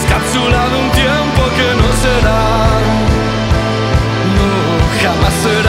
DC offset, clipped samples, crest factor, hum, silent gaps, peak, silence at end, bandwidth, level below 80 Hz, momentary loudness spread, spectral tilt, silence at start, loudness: under 0.1%; under 0.1%; 12 dB; none; none; 0 dBFS; 0 s; 16 kHz; -18 dBFS; 2 LU; -5 dB/octave; 0 s; -12 LUFS